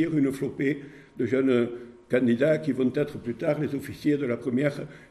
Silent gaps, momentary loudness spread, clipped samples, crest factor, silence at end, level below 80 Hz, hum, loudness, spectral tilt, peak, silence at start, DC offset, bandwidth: none; 9 LU; under 0.1%; 16 dB; 0.05 s; -62 dBFS; none; -26 LUFS; -7.5 dB/octave; -10 dBFS; 0 s; under 0.1%; 13 kHz